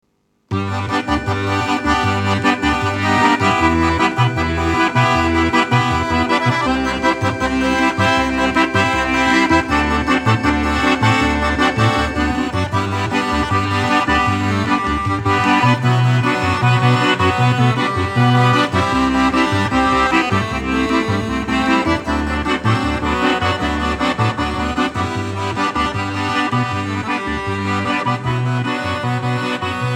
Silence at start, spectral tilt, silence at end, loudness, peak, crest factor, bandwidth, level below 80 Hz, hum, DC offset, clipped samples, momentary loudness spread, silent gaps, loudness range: 0.5 s; -5.5 dB/octave; 0 s; -16 LUFS; -2 dBFS; 14 dB; 14 kHz; -32 dBFS; none; under 0.1%; under 0.1%; 6 LU; none; 4 LU